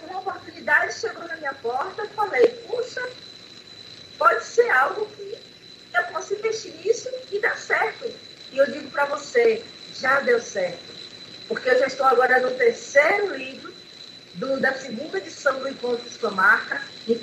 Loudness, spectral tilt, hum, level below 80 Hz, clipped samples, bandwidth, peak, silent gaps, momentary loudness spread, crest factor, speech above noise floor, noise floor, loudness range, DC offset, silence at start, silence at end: -23 LUFS; -3 dB/octave; none; -70 dBFS; under 0.1%; 14 kHz; -4 dBFS; none; 20 LU; 20 dB; 23 dB; -46 dBFS; 5 LU; under 0.1%; 0 s; 0 s